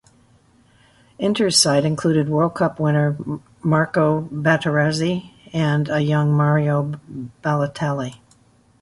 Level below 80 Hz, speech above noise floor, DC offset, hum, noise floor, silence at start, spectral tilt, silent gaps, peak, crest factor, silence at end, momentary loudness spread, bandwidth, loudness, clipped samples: -56 dBFS; 36 dB; under 0.1%; none; -55 dBFS; 1.2 s; -5 dB/octave; none; -2 dBFS; 18 dB; 0.65 s; 12 LU; 11.5 kHz; -20 LUFS; under 0.1%